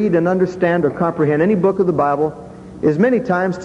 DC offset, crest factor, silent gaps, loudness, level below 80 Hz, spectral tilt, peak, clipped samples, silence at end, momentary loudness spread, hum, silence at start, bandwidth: under 0.1%; 14 dB; none; -16 LUFS; -50 dBFS; -8.5 dB/octave; -2 dBFS; under 0.1%; 0 s; 6 LU; none; 0 s; 9.4 kHz